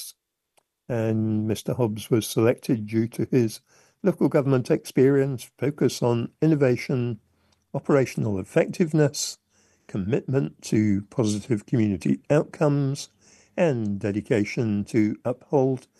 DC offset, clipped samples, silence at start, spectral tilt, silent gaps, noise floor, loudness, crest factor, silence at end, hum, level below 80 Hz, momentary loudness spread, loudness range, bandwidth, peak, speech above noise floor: under 0.1%; under 0.1%; 0 s; -6.5 dB/octave; none; -69 dBFS; -24 LUFS; 18 dB; 0.2 s; none; -62 dBFS; 9 LU; 2 LU; 12.5 kHz; -6 dBFS; 46 dB